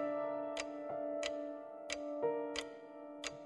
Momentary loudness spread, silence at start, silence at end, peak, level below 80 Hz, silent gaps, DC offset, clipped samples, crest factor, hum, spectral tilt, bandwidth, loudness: 10 LU; 0 s; 0 s; -24 dBFS; -74 dBFS; none; under 0.1%; under 0.1%; 18 dB; none; -2.5 dB/octave; 11.5 kHz; -42 LUFS